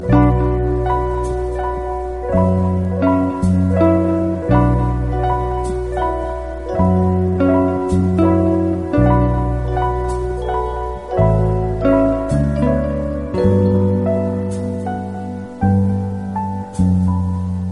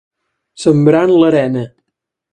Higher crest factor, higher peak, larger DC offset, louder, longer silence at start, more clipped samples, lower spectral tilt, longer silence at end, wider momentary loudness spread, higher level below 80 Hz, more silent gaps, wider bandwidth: about the same, 16 dB vs 14 dB; about the same, 0 dBFS vs 0 dBFS; first, 0.5% vs under 0.1%; second, -17 LUFS vs -12 LUFS; second, 0 s vs 0.6 s; neither; first, -9.5 dB/octave vs -7.5 dB/octave; second, 0 s vs 0.65 s; about the same, 9 LU vs 11 LU; first, -26 dBFS vs -54 dBFS; neither; first, 11 kHz vs 9.8 kHz